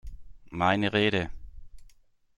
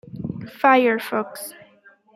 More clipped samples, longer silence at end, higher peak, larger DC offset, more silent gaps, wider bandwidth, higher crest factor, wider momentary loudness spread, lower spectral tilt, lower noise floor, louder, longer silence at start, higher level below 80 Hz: neither; second, 0.5 s vs 0.65 s; second, -8 dBFS vs -2 dBFS; neither; neither; second, 11 kHz vs 16 kHz; about the same, 22 dB vs 20 dB; second, 15 LU vs 18 LU; about the same, -6 dB/octave vs -5 dB/octave; first, -59 dBFS vs -53 dBFS; second, -26 LUFS vs -19 LUFS; about the same, 0.05 s vs 0.15 s; first, -48 dBFS vs -60 dBFS